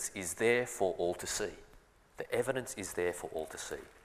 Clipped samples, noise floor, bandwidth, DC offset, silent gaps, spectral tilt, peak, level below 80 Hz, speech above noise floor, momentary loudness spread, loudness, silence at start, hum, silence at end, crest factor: under 0.1%; -61 dBFS; 15.5 kHz; under 0.1%; none; -3 dB/octave; -16 dBFS; -62 dBFS; 26 dB; 12 LU; -35 LUFS; 0 s; none; 0.05 s; 20 dB